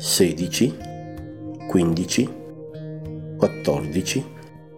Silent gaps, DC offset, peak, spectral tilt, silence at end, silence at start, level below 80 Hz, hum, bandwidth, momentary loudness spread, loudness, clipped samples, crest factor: none; 0.2%; -2 dBFS; -4.5 dB/octave; 0 s; 0 s; -52 dBFS; none; 17.5 kHz; 16 LU; -23 LUFS; under 0.1%; 22 dB